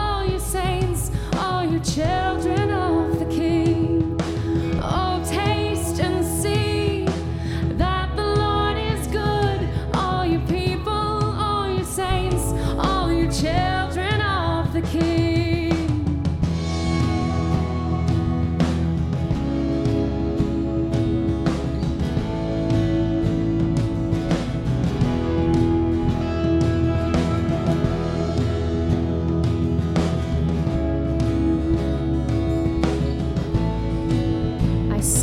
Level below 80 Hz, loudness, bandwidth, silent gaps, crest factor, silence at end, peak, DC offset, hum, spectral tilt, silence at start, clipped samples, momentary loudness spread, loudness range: -30 dBFS; -22 LUFS; 16 kHz; none; 14 dB; 0 s; -6 dBFS; under 0.1%; none; -6 dB/octave; 0 s; under 0.1%; 3 LU; 1 LU